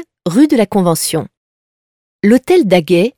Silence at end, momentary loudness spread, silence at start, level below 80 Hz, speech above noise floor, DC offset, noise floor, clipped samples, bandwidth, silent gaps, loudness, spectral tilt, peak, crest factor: 0.1 s; 7 LU; 0 s; -52 dBFS; over 79 dB; under 0.1%; under -90 dBFS; under 0.1%; 19 kHz; 1.37-2.19 s; -12 LUFS; -5.5 dB/octave; 0 dBFS; 14 dB